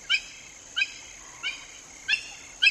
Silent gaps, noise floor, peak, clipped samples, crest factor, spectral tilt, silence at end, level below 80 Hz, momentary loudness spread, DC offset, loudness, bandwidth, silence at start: none; -46 dBFS; -8 dBFS; under 0.1%; 22 dB; 2 dB/octave; 0 s; -62 dBFS; 16 LU; under 0.1%; -28 LUFS; 14 kHz; 0 s